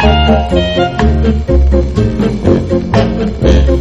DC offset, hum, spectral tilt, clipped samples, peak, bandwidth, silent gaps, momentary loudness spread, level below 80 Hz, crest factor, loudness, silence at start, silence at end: under 0.1%; none; -7.5 dB/octave; 0.5%; 0 dBFS; 7.8 kHz; none; 3 LU; -14 dBFS; 10 dB; -11 LUFS; 0 s; 0 s